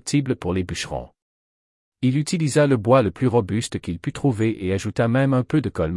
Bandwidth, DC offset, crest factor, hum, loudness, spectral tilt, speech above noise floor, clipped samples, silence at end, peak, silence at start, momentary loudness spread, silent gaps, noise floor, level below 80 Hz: 12 kHz; under 0.1%; 16 dB; none; -21 LUFS; -6.5 dB/octave; over 69 dB; under 0.1%; 0 s; -4 dBFS; 0.05 s; 10 LU; 1.22-1.92 s; under -90 dBFS; -50 dBFS